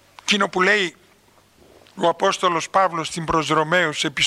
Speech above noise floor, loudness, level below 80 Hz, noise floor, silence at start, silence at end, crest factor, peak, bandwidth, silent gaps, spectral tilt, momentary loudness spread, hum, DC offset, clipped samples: 35 dB; -20 LUFS; -52 dBFS; -55 dBFS; 0.25 s; 0 s; 18 dB; -4 dBFS; 14 kHz; none; -3 dB/octave; 5 LU; none; under 0.1%; under 0.1%